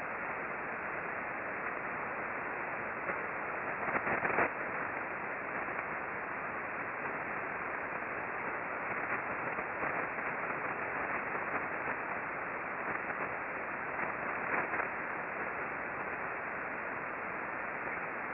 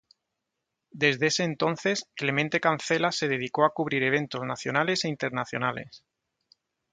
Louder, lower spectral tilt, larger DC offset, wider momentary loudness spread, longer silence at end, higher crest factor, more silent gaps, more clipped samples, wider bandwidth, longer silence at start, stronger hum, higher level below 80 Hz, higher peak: second, -37 LUFS vs -26 LUFS; about the same, -4.5 dB/octave vs -4 dB/octave; neither; about the same, 4 LU vs 6 LU; second, 0 s vs 0.95 s; about the same, 20 dB vs 22 dB; neither; neither; second, 5.6 kHz vs 9.4 kHz; second, 0 s vs 0.95 s; neither; about the same, -68 dBFS vs -70 dBFS; second, -16 dBFS vs -6 dBFS